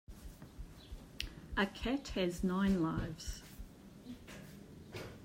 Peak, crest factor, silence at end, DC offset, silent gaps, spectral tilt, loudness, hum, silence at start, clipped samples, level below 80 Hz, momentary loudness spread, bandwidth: -18 dBFS; 22 dB; 0 s; under 0.1%; none; -5.5 dB/octave; -38 LUFS; none; 0.1 s; under 0.1%; -52 dBFS; 20 LU; 16 kHz